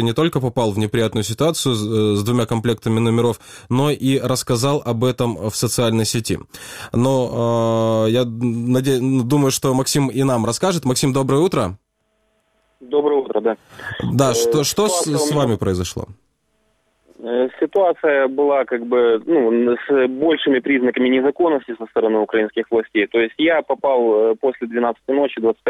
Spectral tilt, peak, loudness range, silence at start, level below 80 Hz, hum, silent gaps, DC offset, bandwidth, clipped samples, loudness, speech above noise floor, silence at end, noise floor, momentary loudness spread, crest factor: -5.5 dB/octave; -2 dBFS; 3 LU; 0 s; -50 dBFS; none; none; under 0.1%; 16 kHz; under 0.1%; -18 LUFS; 49 dB; 0 s; -67 dBFS; 6 LU; 16 dB